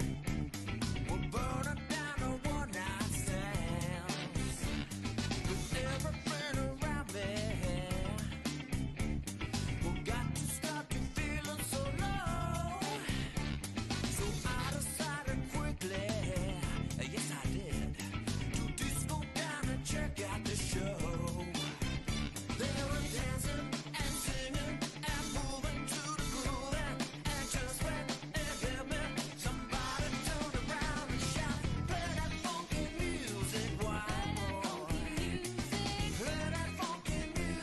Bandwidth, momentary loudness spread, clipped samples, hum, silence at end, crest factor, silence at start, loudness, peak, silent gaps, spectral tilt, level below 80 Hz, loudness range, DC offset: 12.5 kHz; 2 LU; under 0.1%; none; 0 s; 12 dB; 0 s; -38 LUFS; -24 dBFS; none; -4.5 dB/octave; -44 dBFS; 1 LU; under 0.1%